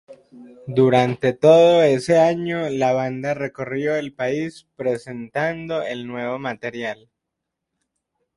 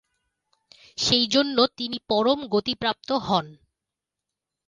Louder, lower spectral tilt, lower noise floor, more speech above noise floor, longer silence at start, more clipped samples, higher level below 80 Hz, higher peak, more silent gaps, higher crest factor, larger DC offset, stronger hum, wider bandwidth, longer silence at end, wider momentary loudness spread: first, -20 LUFS vs -23 LUFS; first, -6.5 dB/octave vs -3.5 dB/octave; second, -81 dBFS vs -87 dBFS; about the same, 62 dB vs 63 dB; second, 0.1 s vs 1 s; neither; about the same, -62 dBFS vs -58 dBFS; first, 0 dBFS vs -6 dBFS; neither; about the same, 20 dB vs 20 dB; neither; neither; about the same, 11.5 kHz vs 11 kHz; first, 1.4 s vs 1.15 s; first, 14 LU vs 8 LU